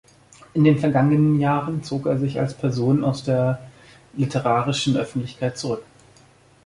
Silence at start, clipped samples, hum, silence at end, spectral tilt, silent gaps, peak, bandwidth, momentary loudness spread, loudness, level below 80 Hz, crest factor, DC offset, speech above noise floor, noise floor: 0.55 s; under 0.1%; none; 0.85 s; -7 dB/octave; none; -4 dBFS; 11.5 kHz; 11 LU; -22 LUFS; -56 dBFS; 18 dB; under 0.1%; 33 dB; -53 dBFS